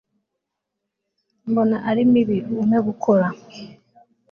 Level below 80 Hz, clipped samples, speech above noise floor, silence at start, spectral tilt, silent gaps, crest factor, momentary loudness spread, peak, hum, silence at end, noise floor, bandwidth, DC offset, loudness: -62 dBFS; under 0.1%; 62 dB; 1.45 s; -8.5 dB/octave; none; 16 dB; 20 LU; -6 dBFS; none; 0.6 s; -81 dBFS; 6.8 kHz; under 0.1%; -19 LUFS